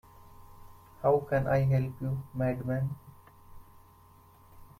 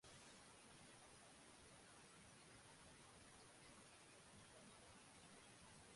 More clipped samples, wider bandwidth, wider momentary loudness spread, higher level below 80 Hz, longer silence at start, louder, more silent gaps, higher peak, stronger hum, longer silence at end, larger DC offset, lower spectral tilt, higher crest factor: neither; first, 15.5 kHz vs 11.5 kHz; first, 9 LU vs 1 LU; first, -56 dBFS vs -82 dBFS; first, 0.25 s vs 0 s; first, -30 LUFS vs -64 LUFS; neither; first, -14 dBFS vs -50 dBFS; neither; first, 0.15 s vs 0 s; neither; first, -9.5 dB/octave vs -2.5 dB/octave; first, 20 dB vs 14 dB